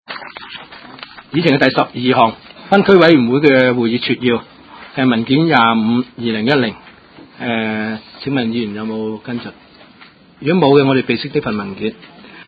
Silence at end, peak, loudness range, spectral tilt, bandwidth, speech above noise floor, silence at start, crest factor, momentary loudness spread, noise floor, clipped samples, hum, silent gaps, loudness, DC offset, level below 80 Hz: 0.05 s; 0 dBFS; 9 LU; -8 dB/octave; 7.8 kHz; 30 dB; 0.1 s; 16 dB; 18 LU; -44 dBFS; under 0.1%; none; none; -15 LUFS; under 0.1%; -52 dBFS